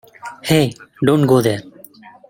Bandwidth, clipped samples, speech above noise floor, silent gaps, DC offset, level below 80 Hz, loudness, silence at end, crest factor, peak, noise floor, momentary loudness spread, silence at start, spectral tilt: 17 kHz; under 0.1%; 28 dB; none; under 0.1%; -52 dBFS; -16 LUFS; 0.6 s; 16 dB; 0 dBFS; -42 dBFS; 14 LU; 0.25 s; -6 dB/octave